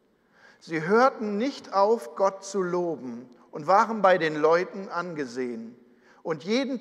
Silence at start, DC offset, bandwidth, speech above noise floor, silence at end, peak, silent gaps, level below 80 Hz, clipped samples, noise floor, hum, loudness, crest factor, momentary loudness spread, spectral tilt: 0.65 s; under 0.1%; 12 kHz; 33 dB; 0 s; -6 dBFS; none; -84 dBFS; under 0.1%; -59 dBFS; none; -25 LUFS; 20 dB; 15 LU; -5.5 dB/octave